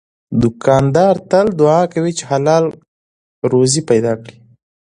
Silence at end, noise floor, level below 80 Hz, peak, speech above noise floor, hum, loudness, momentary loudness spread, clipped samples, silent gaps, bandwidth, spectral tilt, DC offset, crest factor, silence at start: 0.55 s; under -90 dBFS; -46 dBFS; 0 dBFS; over 77 dB; none; -14 LUFS; 9 LU; under 0.1%; 2.88-3.42 s; 11 kHz; -6 dB/octave; under 0.1%; 14 dB; 0.3 s